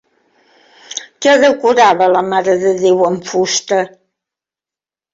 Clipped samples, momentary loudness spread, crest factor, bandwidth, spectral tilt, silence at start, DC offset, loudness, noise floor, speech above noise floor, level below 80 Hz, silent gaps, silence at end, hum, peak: under 0.1%; 14 LU; 14 dB; 7.8 kHz; -3.5 dB/octave; 0.9 s; under 0.1%; -12 LUFS; -89 dBFS; 78 dB; -60 dBFS; none; 1.25 s; none; 0 dBFS